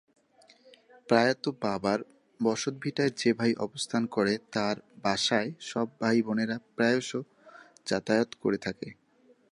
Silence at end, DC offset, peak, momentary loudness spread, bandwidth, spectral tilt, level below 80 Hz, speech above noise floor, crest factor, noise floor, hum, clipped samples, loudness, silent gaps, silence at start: 0.6 s; under 0.1%; -8 dBFS; 8 LU; 11 kHz; -4.5 dB/octave; -68 dBFS; 35 dB; 22 dB; -63 dBFS; none; under 0.1%; -29 LUFS; none; 1.1 s